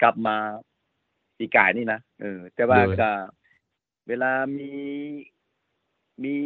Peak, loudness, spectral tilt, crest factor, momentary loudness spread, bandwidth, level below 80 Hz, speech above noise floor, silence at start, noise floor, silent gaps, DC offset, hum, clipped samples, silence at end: 0 dBFS; -24 LUFS; -9.5 dB/octave; 24 dB; 17 LU; 4.6 kHz; -64 dBFS; 52 dB; 0 s; -76 dBFS; none; under 0.1%; none; under 0.1%; 0 s